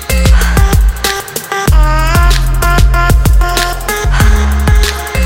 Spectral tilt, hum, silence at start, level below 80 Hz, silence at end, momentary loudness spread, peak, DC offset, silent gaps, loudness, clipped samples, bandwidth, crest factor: -4.5 dB/octave; none; 0 s; -10 dBFS; 0 s; 5 LU; 0 dBFS; under 0.1%; none; -11 LUFS; 0.5%; 17 kHz; 8 dB